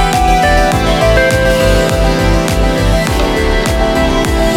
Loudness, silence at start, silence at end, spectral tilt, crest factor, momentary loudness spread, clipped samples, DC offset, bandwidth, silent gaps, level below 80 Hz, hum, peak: -11 LUFS; 0 s; 0 s; -5 dB/octave; 10 dB; 3 LU; under 0.1%; under 0.1%; 17 kHz; none; -16 dBFS; none; 0 dBFS